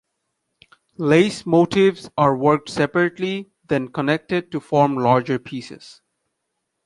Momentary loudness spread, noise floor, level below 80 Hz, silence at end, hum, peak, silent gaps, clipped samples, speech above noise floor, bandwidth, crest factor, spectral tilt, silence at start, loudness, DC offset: 10 LU; -76 dBFS; -58 dBFS; 0.95 s; none; -2 dBFS; none; under 0.1%; 57 dB; 11.5 kHz; 18 dB; -6.5 dB/octave; 1 s; -19 LUFS; under 0.1%